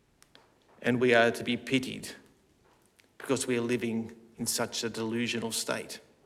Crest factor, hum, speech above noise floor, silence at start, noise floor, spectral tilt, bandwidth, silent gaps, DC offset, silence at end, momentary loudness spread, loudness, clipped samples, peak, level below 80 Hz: 24 dB; none; 35 dB; 0.8 s; -65 dBFS; -3.5 dB/octave; 16.5 kHz; none; under 0.1%; 0.25 s; 16 LU; -30 LUFS; under 0.1%; -8 dBFS; -68 dBFS